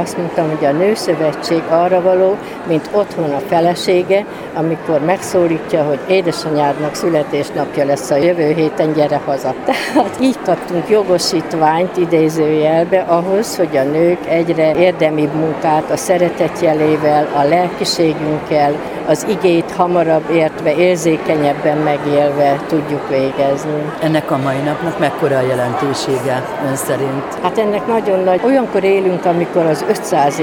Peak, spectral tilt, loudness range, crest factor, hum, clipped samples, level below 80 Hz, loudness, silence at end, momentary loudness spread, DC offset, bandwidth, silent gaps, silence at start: 0 dBFS; -5.5 dB/octave; 2 LU; 14 dB; none; under 0.1%; -50 dBFS; -15 LUFS; 0 s; 5 LU; under 0.1%; 18.5 kHz; none; 0 s